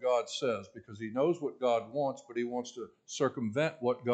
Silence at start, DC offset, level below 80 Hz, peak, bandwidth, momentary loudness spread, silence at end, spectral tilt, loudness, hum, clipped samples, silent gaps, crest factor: 0 s; under 0.1%; -80 dBFS; -16 dBFS; 9 kHz; 12 LU; 0 s; -5 dB/octave; -34 LUFS; none; under 0.1%; none; 16 dB